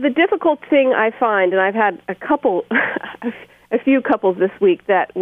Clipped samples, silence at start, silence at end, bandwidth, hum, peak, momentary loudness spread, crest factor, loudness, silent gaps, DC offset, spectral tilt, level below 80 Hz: under 0.1%; 0 s; 0 s; 3.8 kHz; none; -2 dBFS; 9 LU; 14 dB; -17 LUFS; none; under 0.1%; -8 dB/octave; -62 dBFS